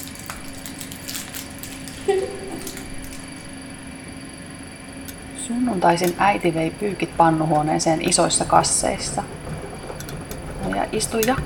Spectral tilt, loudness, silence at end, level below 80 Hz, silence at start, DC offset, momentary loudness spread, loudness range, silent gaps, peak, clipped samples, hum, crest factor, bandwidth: -4 dB/octave; -22 LUFS; 0 s; -42 dBFS; 0 s; under 0.1%; 18 LU; 11 LU; none; 0 dBFS; under 0.1%; none; 22 dB; 19 kHz